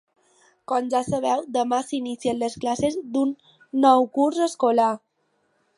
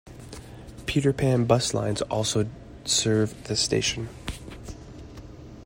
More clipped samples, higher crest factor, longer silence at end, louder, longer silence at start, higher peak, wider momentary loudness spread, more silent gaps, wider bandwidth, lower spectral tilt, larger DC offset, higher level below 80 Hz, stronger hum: neither; about the same, 20 dB vs 22 dB; first, 0.8 s vs 0 s; about the same, -23 LUFS vs -25 LUFS; first, 0.7 s vs 0.05 s; about the same, -4 dBFS vs -6 dBFS; second, 9 LU vs 21 LU; neither; second, 11.5 kHz vs 16 kHz; about the same, -5 dB/octave vs -4.5 dB/octave; neither; second, -62 dBFS vs -46 dBFS; neither